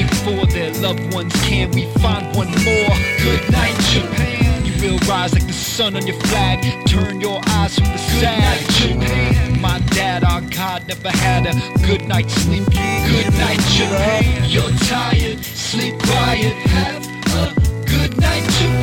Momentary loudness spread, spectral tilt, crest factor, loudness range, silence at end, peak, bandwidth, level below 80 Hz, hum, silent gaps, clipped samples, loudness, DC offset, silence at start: 5 LU; -5 dB/octave; 16 dB; 2 LU; 0 s; 0 dBFS; 18 kHz; -24 dBFS; none; none; under 0.1%; -16 LUFS; under 0.1%; 0 s